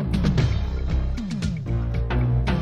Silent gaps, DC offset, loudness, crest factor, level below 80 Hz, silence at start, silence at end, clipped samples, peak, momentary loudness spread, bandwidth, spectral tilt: none; under 0.1%; -25 LUFS; 14 dB; -26 dBFS; 0 s; 0 s; under 0.1%; -8 dBFS; 6 LU; 9.8 kHz; -7.5 dB/octave